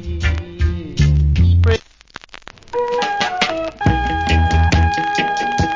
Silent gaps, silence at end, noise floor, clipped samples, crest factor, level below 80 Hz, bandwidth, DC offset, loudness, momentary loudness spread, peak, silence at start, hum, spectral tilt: none; 0 s; -40 dBFS; under 0.1%; 16 dB; -20 dBFS; 7.6 kHz; under 0.1%; -17 LUFS; 8 LU; 0 dBFS; 0 s; none; -6 dB/octave